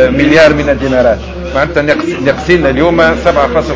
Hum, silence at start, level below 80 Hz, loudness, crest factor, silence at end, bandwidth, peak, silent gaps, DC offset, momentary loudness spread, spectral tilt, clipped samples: none; 0 s; -26 dBFS; -9 LUFS; 10 dB; 0 s; 8 kHz; 0 dBFS; none; under 0.1%; 7 LU; -6 dB/octave; 1%